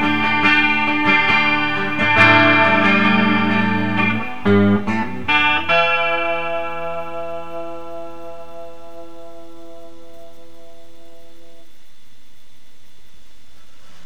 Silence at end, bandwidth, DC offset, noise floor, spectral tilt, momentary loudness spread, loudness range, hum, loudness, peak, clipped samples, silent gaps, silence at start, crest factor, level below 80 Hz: 3.75 s; 10 kHz; 5%; -53 dBFS; -6 dB/octave; 21 LU; 20 LU; none; -15 LUFS; 0 dBFS; under 0.1%; none; 0 s; 20 dB; -54 dBFS